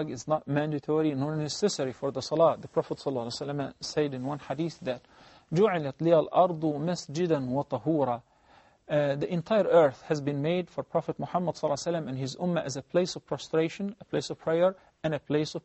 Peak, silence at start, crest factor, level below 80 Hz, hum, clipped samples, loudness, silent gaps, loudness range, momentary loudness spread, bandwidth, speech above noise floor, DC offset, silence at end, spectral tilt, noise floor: -10 dBFS; 0 s; 20 dB; -66 dBFS; none; under 0.1%; -29 LUFS; none; 3 LU; 9 LU; 8.2 kHz; 32 dB; under 0.1%; 0.05 s; -6 dB/octave; -60 dBFS